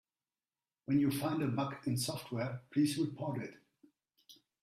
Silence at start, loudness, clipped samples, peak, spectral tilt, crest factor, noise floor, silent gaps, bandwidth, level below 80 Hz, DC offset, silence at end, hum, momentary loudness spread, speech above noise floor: 0.9 s; -36 LUFS; under 0.1%; -20 dBFS; -5.5 dB/octave; 16 dB; under -90 dBFS; none; 15.5 kHz; -72 dBFS; under 0.1%; 0.3 s; none; 8 LU; over 55 dB